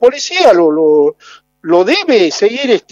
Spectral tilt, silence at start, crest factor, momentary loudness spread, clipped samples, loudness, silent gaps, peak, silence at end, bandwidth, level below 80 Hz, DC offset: -3.5 dB/octave; 0 s; 10 dB; 6 LU; 0.3%; -10 LUFS; none; 0 dBFS; 0.15 s; 8 kHz; -60 dBFS; under 0.1%